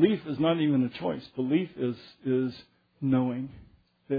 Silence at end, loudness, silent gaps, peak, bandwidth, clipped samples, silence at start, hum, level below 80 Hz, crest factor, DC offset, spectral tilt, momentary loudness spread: 0 s; -29 LUFS; none; -10 dBFS; 5 kHz; under 0.1%; 0 s; none; -64 dBFS; 18 dB; under 0.1%; -10 dB/octave; 11 LU